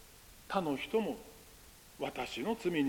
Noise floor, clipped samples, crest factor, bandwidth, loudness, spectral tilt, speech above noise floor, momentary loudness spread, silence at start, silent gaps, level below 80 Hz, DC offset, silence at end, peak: -57 dBFS; under 0.1%; 20 dB; 17 kHz; -37 LUFS; -5 dB/octave; 22 dB; 21 LU; 0 s; none; -64 dBFS; under 0.1%; 0 s; -18 dBFS